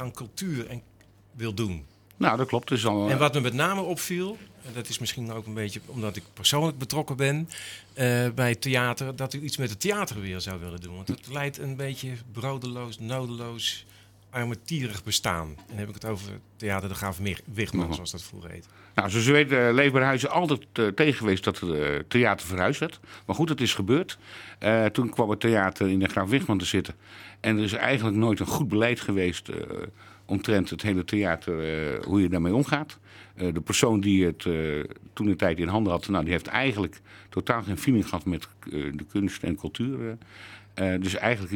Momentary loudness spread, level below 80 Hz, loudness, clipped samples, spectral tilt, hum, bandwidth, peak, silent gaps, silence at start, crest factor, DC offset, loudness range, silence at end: 13 LU; -56 dBFS; -27 LUFS; under 0.1%; -5 dB/octave; none; 19 kHz; 0 dBFS; none; 0 s; 26 dB; under 0.1%; 8 LU; 0 s